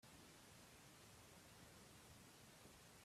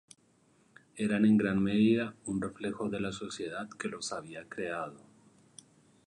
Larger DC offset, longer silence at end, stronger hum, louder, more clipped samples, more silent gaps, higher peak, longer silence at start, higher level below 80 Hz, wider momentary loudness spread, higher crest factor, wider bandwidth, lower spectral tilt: neither; second, 0 s vs 1.1 s; neither; second, -64 LUFS vs -32 LUFS; neither; neither; second, -50 dBFS vs -16 dBFS; second, 0 s vs 0.95 s; second, -80 dBFS vs -64 dBFS; second, 0 LU vs 13 LU; about the same, 16 dB vs 18 dB; first, 15.5 kHz vs 11 kHz; second, -3 dB/octave vs -6 dB/octave